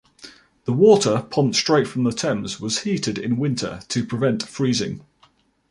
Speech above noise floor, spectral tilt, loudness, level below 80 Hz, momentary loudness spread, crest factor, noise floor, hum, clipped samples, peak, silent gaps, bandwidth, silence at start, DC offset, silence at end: 39 dB; -5 dB/octave; -21 LUFS; -56 dBFS; 11 LU; 18 dB; -59 dBFS; none; under 0.1%; -2 dBFS; none; 11.5 kHz; 0.25 s; under 0.1%; 0.7 s